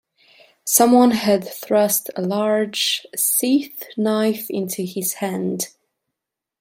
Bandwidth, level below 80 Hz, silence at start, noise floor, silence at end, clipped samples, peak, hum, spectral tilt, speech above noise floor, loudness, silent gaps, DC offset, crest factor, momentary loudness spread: 16.5 kHz; -66 dBFS; 0.65 s; -84 dBFS; 0.95 s; under 0.1%; -2 dBFS; none; -3.5 dB/octave; 65 dB; -19 LUFS; none; under 0.1%; 18 dB; 11 LU